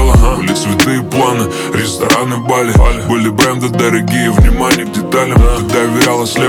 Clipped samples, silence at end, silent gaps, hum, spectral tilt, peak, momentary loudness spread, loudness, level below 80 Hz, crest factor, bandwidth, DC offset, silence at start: under 0.1%; 0 s; none; none; -5 dB/octave; 0 dBFS; 4 LU; -11 LUFS; -16 dBFS; 10 dB; 18.5 kHz; under 0.1%; 0 s